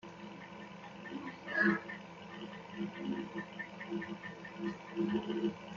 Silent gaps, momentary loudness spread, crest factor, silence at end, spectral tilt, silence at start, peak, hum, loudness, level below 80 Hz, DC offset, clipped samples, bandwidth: none; 17 LU; 22 dB; 0 s; -4.5 dB/octave; 0.05 s; -18 dBFS; none; -40 LUFS; -74 dBFS; under 0.1%; under 0.1%; 7.4 kHz